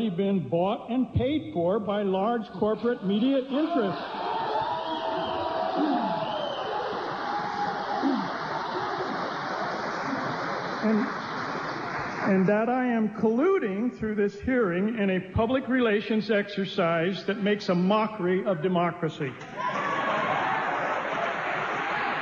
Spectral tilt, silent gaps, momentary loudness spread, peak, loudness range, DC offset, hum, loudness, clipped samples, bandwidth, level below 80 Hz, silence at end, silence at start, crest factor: -7 dB/octave; none; 6 LU; -12 dBFS; 4 LU; under 0.1%; none; -27 LUFS; under 0.1%; 7.4 kHz; -56 dBFS; 0 s; 0 s; 16 dB